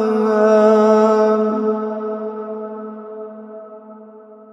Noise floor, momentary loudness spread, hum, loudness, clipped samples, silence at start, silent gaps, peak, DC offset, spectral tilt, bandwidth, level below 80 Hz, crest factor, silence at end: -40 dBFS; 22 LU; none; -15 LUFS; under 0.1%; 0 s; none; -2 dBFS; under 0.1%; -7 dB/octave; 8 kHz; -78 dBFS; 14 dB; 0.2 s